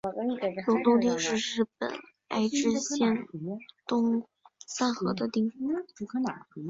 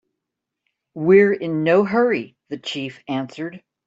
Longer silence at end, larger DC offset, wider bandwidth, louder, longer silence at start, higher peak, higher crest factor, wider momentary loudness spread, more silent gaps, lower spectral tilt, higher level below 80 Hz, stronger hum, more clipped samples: second, 0 s vs 0.3 s; neither; about the same, 7.8 kHz vs 7.8 kHz; second, -29 LUFS vs -19 LUFS; second, 0.05 s vs 0.95 s; second, -10 dBFS vs -4 dBFS; about the same, 18 dB vs 18 dB; second, 11 LU vs 17 LU; neither; second, -4.5 dB/octave vs -7 dB/octave; about the same, -70 dBFS vs -66 dBFS; neither; neither